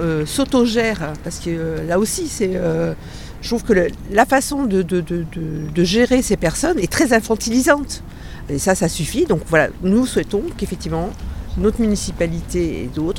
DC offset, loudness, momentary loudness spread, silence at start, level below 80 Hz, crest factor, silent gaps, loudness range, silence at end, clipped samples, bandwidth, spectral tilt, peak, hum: under 0.1%; -19 LUFS; 11 LU; 0 s; -34 dBFS; 18 dB; none; 3 LU; 0 s; under 0.1%; 17.5 kHz; -5 dB/octave; 0 dBFS; none